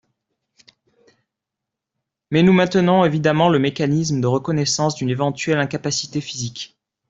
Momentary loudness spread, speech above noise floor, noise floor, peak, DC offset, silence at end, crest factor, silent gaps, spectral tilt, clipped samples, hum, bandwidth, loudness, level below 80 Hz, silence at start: 12 LU; 66 dB; -84 dBFS; -2 dBFS; under 0.1%; 0.45 s; 18 dB; none; -5.5 dB/octave; under 0.1%; none; 8 kHz; -19 LUFS; -56 dBFS; 2.3 s